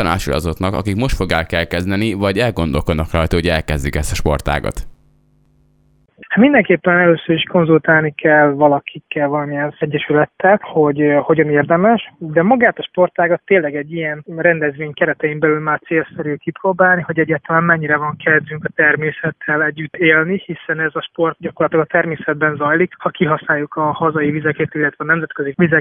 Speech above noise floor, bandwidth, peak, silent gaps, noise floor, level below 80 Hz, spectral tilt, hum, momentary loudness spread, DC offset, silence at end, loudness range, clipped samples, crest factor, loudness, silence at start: 40 dB; 18.5 kHz; 0 dBFS; none; -55 dBFS; -34 dBFS; -6.5 dB/octave; none; 8 LU; under 0.1%; 0 s; 4 LU; under 0.1%; 16 dB; -16 LUFS; 0 s